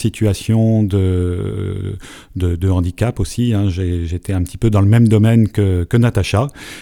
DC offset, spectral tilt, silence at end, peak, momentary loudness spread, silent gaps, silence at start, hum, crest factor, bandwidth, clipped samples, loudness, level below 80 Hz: under 0.1%; -7.5 dB/octave; 0 s; 0 dBFS; 11 LU; none; 0 s; none; 14 dB; 13.5 kHz; under 0.1%; -16 LUFS; -32 dBFS